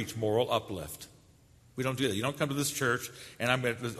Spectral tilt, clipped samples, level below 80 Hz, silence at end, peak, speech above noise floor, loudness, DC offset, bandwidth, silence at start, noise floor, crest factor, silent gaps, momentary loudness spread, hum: -4 dB/octave; under 0.1%; -62 dBFS; 0 s; -10 dBFS; 28 dB; -31 LUFS; under 0.1%; 13.5 kHz; 0 s; -60 dBFS; 24 dB; none; 14 LU; none